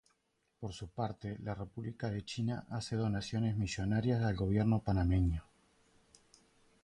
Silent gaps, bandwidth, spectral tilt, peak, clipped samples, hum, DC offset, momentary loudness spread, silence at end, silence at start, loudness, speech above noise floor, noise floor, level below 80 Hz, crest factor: none; 10.5 kHz; -7 dB/octave; -20 dBFS; under 0.1%; none; under 0.1%; 12 LU; 1.45 s; 0.6 s; -36 LUFS; 45 dB; -79 dBFS; -48 dBFS; 16 dB